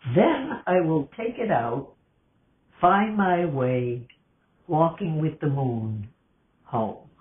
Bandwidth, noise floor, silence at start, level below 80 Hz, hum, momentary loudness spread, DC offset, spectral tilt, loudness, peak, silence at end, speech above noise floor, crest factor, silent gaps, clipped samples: 3.8 kHz; -66 dBFS; 0.05 s; -60 dBFS; none; 11 LU; under 0.1%; -11.5 dB/octave; -25 LUFS; -6 dBFS; 0.2 s; 42 dB; 20 dB; none; under 0.1%